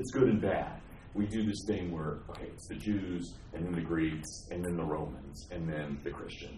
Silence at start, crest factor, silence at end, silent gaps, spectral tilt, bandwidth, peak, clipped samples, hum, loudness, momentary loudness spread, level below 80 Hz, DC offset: 0 s; 20 dB; 0 s; none; -6.5 dB/octave; 13 kHz; -14 dBFS; under 0.1%; none; -36 LUFS; 13 LU; -52 dBFS; under 0.1%